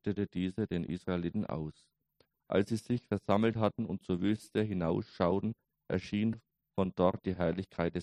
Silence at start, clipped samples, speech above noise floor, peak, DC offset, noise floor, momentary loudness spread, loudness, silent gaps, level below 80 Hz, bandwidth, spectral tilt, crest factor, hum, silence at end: 0.05 s; under 0.1%; 41 dB; -12 dBFS; under 0.1%; -74 dBFS; 8 LU; -34 LUFS; none; -60 dBFS; 12 kHz; -8 dB/octave; 22 dB; none; 0 s